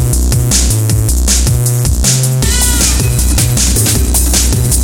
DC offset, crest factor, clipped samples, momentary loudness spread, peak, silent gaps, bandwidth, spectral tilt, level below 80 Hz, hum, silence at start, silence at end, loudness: under 0.1%; 10 dB; under 0.1%; 2 LU; 0 dBFS; none; over 20 kHz; -3.5 dB/octave; -14 dBFS; none; 0 s; 0 s; -10 LUFS